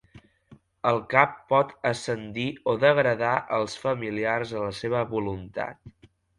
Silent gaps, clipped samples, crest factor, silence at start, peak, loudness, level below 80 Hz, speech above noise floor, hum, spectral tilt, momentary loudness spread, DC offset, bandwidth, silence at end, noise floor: none; under 0.1%; 24 dB; 0.15 s; -2 dBFS; -26 LUFS; -58 dBFS; 30 dB; none; -5.5 dB/octave; 10 LU; under 0.1%; 11.5 kHz; 0.5 s; -56 dBFS